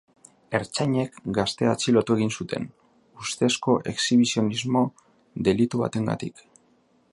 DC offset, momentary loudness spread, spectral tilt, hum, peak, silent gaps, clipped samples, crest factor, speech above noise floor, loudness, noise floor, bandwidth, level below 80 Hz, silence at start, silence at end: under 0.1%; 11 LU; -5 dB/octave; none; -6 dBFS; none; under 0.1%; 20 dB; 39 dB; -24 LUFS; -63 dBFS; 11.5 kHz; -58 dBFS; 0.5 s; 0.8 s